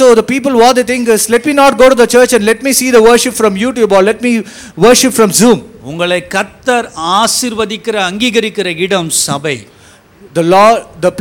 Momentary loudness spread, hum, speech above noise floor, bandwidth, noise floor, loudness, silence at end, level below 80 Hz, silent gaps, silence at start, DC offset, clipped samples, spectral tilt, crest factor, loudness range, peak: 9 LU; none; 31 dB; 19 kHz; -40 dBFS; -9 LUFS; 0 s; -42 dBFS; none; 0 s; under 0.1%; 0.1%; -3.5 dB/octave; 10 dB; 5 LU; 0 dBFS